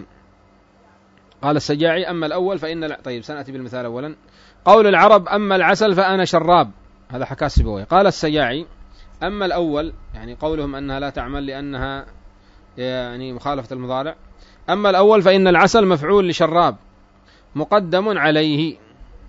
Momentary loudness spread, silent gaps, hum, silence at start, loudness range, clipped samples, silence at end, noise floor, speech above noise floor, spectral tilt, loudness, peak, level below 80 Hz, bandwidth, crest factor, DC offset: 17 LU; none; none; 0 s; 12 LU; under 0.1%; 0 s; -52 dBFS; 35 dB; -5.5 dB/octave; -17 LUFS; 0 dBFS; -36 dBFS; 8 kHz; 18 dB; under 0.1%